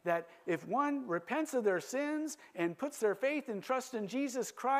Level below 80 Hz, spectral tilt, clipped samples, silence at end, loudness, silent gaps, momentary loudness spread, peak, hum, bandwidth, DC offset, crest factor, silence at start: -88 dBFS; -4.5 dB/octave; under 0.1%; 0 s; -36 LUFS; none; 6 LU; -20 dBFS; none; 15 kHz; under 0.1%; 16 dB; 0.05 s